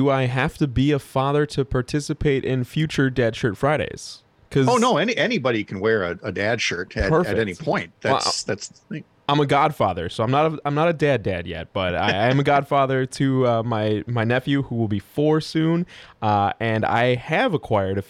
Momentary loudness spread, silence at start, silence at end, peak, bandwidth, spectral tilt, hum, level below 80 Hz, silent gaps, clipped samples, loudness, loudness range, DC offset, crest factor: 7 LU; 0 s; 0.05 s; -8 dBFS; 14 kHz; -6 dB/octave; none; -44 dBFS; none; under 0.1%; -21 LUFS; 2 LU; under 0.1%; 14 dB